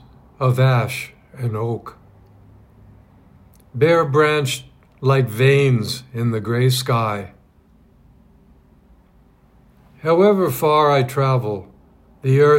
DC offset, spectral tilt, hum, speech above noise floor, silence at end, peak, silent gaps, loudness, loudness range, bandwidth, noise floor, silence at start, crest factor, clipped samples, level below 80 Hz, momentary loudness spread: under 0.1%; -6.5 dB/octave; none; 36 dB; 0 s; -2 dBFS; none; -18 LUFS; 7 LU; 16.5 kHz; -53 dBFS; 0.4 s; 18 dB; under 0.1%; -54 dBFS; 14 LU